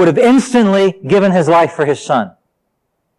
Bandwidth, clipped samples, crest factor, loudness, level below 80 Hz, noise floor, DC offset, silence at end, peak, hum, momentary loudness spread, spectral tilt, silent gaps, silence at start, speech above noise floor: 12 kHz; under 0.1%; 10 dB; -12 LUFS; -58 dBFS; -68 dBFS; under 0.1%; 0.9 s; -2 dBFS; none; 7 LU; -6 dB/octave; none; 0 s; 57 dB